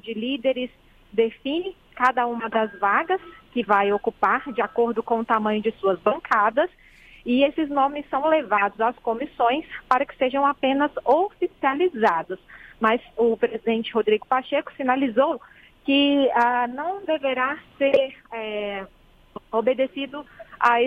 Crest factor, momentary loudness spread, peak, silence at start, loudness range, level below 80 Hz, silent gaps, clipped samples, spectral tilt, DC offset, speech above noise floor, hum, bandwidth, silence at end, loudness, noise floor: 20 dB; 9 LU; -2 dBFS; 0.05 s; 2 LU; -58 dBFS; none; under 0.1%; -6 dB/octave; under 0.1%; 21 dB; none; 8.2 kHz; 0 s; -23 LUFS; -44 dBFS